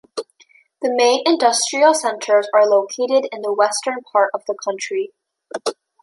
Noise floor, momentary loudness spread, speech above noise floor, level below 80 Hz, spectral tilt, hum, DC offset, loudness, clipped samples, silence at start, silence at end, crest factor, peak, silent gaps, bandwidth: -54 dBFS; 12 LU; 37 dB; -76 dBFS; -1 dB/octave; none; under 0.1%; -18 LUFS; under 0.1%; 0.15 s; 0.3 s; 16 dB; -2 dBFS; none; 11.5 kHz